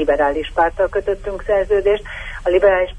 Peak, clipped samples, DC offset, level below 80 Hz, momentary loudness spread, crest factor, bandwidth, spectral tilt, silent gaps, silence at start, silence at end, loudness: -2 dBFS; under 0.1%; under 0.1%; -34 dBFS; 9 LU; 14 dB; 10 kHz; -6 dB/octave; none; 0 s; 0 s; -18 LUFS